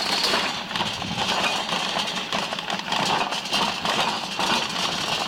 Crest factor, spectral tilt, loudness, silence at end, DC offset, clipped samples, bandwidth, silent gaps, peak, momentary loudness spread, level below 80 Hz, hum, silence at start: 14 dB; -2 dB/octave; -23 LUFS; 0 s; under 0.1%; under 0.1%; 17 kHz; none; -10 dBFS; 4 LU; -56 dBFS; none; 0 s